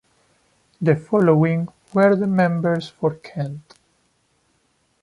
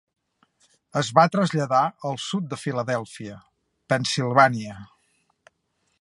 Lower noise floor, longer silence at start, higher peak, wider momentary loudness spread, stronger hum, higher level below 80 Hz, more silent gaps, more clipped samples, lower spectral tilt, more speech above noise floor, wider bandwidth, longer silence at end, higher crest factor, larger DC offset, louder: second, -65 dBFS vs -72 dBFS; second, 0.8 s vs 0.95 s; about the same, -4 dBFS vs -2 dBFS; second, 13 LU vs 19 LU; neither; about the same, -62 dBFS vs -66 dBFS; neither; neither; first, -9 dB/octave vs -5 dB/octave; about the same, 47 dB vs 50 dB; about the same, 11 kHz vs 11.5 kHz; first, 1.4 s vs 1.15 s; second, 18 dB vs 24 dB; neither; first, -20 LUFS vs -23 LUFS